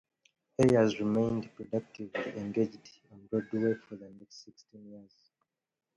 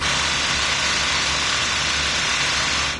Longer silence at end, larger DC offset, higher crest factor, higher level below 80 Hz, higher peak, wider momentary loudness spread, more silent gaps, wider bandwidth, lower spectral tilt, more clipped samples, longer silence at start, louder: first, 0.95 s vs 0 s; neither; first, 20 dB vs 14 dB; second, -64 dBFS vs -40 dBFS; second, -12 dBFS vs -8 dBFS; first, 25 LU vs 1 LU; neither; about the same, 11.5 kHz vs 11 kHz; first, -7 dB/octave vs -0.5 dB/octave; neither; first, 0.6 s vs 0 s; second, -31 LUFS vs -18 LUFS